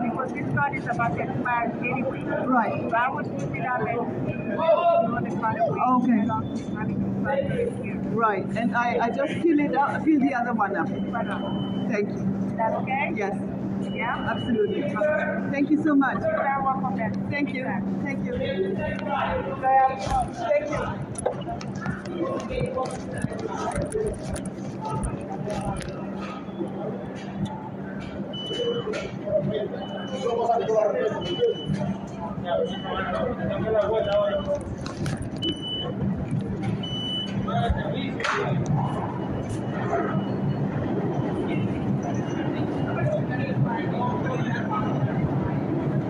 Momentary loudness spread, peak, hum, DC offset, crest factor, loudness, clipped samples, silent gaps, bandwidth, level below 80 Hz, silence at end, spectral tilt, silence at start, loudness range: 9 LU; -10 dBFS; none; under 0.1%; 16 dB; -26 LUFS; under 0.1%; none; 11.5 kHz; -48 dBFS; 0 s; -6.5 dB/octave; 0 s; 6 LU